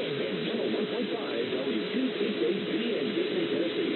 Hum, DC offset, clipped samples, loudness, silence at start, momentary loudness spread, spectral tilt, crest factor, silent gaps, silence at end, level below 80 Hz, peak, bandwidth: none; under 0.1%; under 0.1%; -30 LUFS; 0 s; 2 LU; -8.5 dB/octave; 12 dB; none; 0 s; -80 dBFS; -18 dBFS; 4.4 kHz